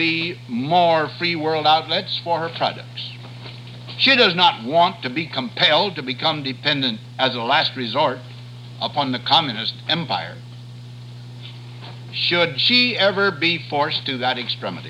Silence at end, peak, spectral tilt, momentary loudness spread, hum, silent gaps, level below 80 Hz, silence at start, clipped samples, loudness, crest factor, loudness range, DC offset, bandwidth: 0 s; -2 dBFS; -5.5 dB/octave; 21 LU; none; none; -62 dBFS; 0 s; under 0.1%; -19 LUFS; 18 dB; 5 LU; under 0.1%; 12 kHz